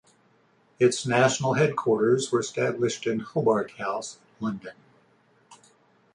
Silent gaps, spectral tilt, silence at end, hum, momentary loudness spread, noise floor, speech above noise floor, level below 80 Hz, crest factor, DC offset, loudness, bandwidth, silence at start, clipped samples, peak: none; -5 dB/octave; 0.6 s; none; 12 LU; -63 dBFS; 38 dB; -66 dBFS; 20 dB; under 0.1%; -25 LUFS; 11 kHz; 0.8 s; under 0.1%; -6 dBFS